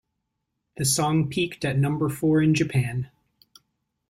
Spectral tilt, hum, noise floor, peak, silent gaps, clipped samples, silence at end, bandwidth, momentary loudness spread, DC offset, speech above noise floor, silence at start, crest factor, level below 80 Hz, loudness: -5 dB/octave; none; -79 dBFS; -10 dBFS; none; under 0.1%; 1.05 s; 15.5 kHz; 8 LU; under 0.1%; 57 dB; 0.8 s; 14 dB; -56 dBFS; -24 LUFS